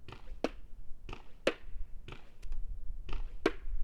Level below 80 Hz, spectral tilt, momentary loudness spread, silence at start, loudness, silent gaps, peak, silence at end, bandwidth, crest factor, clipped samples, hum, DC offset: -42 dBFS; -5.5 dB/octave; 16 LU; 0 s; -41 LUFS; none; -14 dBFS; 0 s; 9.8 kHz; 20 dB; under 0.1%; none; under 0.1%